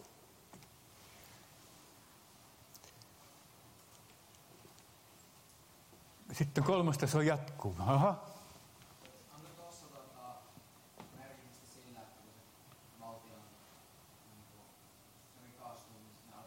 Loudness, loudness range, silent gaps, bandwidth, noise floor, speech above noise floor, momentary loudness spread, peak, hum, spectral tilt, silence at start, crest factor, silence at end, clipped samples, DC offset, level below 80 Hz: -34 LUFS; 23 LU; none; 16 kHz; -63 dBFS; 30 dB; 27 LU; -20 dBFS; none; -6 dB/octave; 0 s; 22 dB; 0 s; under 0.1%; under 0.1%; -74 dBFS